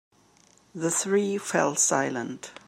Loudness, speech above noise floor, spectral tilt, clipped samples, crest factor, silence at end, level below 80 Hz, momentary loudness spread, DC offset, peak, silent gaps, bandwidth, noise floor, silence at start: -25 LUFS; 33 dB; -3 dB/octave; under 0.1%; 20 dB; 0.15 s; -76 dBFS; 12 LU; under 0.1%; -8 dBFS; none; 16 kHz; -60 dBFS; 0.75 s